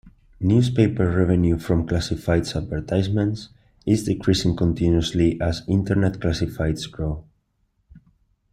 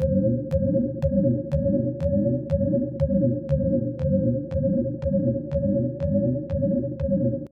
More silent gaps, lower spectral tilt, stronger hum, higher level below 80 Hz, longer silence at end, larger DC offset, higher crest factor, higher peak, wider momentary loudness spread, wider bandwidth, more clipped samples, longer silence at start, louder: neither; second, -7 dB/octave vs -12 dB/octave; neither; about the same, -38 dBFS vs -38 dBFS; first, 0.55 s vs 0.05 s; neither; about the same, 18 dB vs 14 dB; first, -4 dBFS vs -10 dBFS; first, 8 LU vs 2 LU; first, 14 kHz vs 5.2 kHz; neither; about the same, 0.05 s vs 0 s; about the same, -22 LUFS vs -24 LUFS